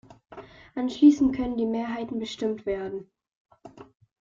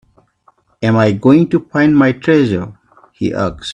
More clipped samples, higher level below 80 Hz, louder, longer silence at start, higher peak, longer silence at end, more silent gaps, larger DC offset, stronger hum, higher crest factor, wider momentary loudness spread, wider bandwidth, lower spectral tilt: neither; second, -56 dBFS vs -46 dBFS; second, -25 LUFS vs -13 LUFS; second, 0.3 s vs 0.8 s; second, -6 dBFS vs 0 dBFS; first, 0.4 s vs 0 s; first, 3.35-3.45 s vs none; neither; neither; first, 20 dB vs 14 dB; first, 22 LU vs 10 LU; second, 7.4 kHz vs 9.6 kHz; second, -6 dB/octave vs -7.5 dB/octave